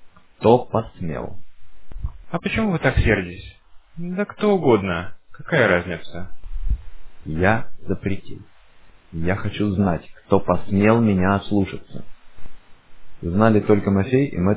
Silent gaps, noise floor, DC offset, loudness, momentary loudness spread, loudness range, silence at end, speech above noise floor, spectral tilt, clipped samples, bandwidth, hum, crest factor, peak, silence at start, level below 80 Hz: none; -46 dBFS; under 0.1%; -21 LUFS; 19 LU; 4 LU; 0 s; 26 dB; -11 dB/octave; under 0.1%; 4 kHz; none; 20 dB; 0 dBFS; 0 s; -36 dBFS